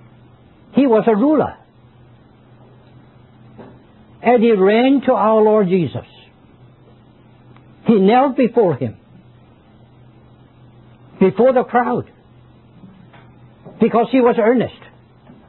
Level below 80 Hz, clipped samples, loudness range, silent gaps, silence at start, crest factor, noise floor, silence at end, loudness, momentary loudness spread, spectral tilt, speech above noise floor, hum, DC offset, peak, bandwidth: -56 dBFS; under 0.1%; 5 LU; none; 0.75 s; 16 dB; -47 dBFS; 0.75 s; -15 LUFS; 11 LU; -12 dB/octave; 33 dB; none; under 0.1%; -2 dBFS; 4.2 kHz